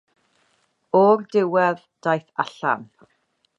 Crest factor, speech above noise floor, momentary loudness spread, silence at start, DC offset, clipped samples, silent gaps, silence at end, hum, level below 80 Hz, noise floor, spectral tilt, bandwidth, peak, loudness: 18 dB; 46 dB; 11 LU; 0.95 s; under 0.1%; under 0.1%; none; 0.75 s; none; -78 dBFS; -66 dBFS; -7 dB/octave; 7.8 kHz; -4 dBFS; -21 LUFS